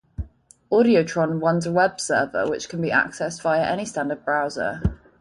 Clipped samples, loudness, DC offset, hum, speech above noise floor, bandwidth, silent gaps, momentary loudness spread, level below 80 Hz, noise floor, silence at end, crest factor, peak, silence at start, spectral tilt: under 0.1%; -22 LUFS; under 0.1%; none; 27 dB; 11.5 kHz; none; 8 LU; -40 dBFS; -48 dBFS; 0.25 s; 18 dB; -6 dBFS; 0.2 s; -5.5 dB/octave